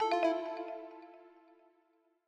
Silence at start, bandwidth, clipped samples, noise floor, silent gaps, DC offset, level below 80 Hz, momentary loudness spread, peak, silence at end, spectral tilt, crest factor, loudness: 0 s; 9.2 kHz; under 0.1%; -73 dBFS; none; under 0.1%; -88 dBFS; 24 LU; -20 dBFS; 1 s; -3 dB/octave; 18 dB; -36 LUFS